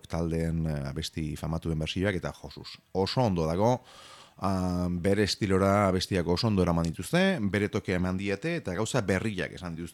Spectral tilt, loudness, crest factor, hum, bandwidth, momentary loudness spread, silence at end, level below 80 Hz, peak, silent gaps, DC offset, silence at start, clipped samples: -6 dB/octave; -29 LUFS; 18 dB; none; 14 kHz; 9 LU; 0 s; -48 dBFS; -10 dBFS; none; under 0.1%; 0.1 s; under 0.1%